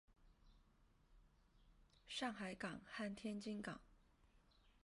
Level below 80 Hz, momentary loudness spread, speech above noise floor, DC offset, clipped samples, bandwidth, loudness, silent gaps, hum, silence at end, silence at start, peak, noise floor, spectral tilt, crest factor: -74 dBFS; 5 LU; 26 dB; under 0.1%; under 0.1%; 11.5 kHz; -49 LUFS; none; none; 0.05 s; 0.1 s; -32 dBFS; -74 dBFS; -4.5 dB/octave; 22 dB